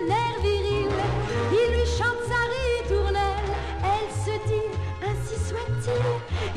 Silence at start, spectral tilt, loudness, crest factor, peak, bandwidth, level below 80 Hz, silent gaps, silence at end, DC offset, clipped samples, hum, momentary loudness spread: 0 s; -5.5 dB/octave; -26 LUFS; 14 dB; -12 dBFS; 12.5 kHz; -32 dBFS; none; 0 s; under 0.1%; under 0.1%; none; 6 LU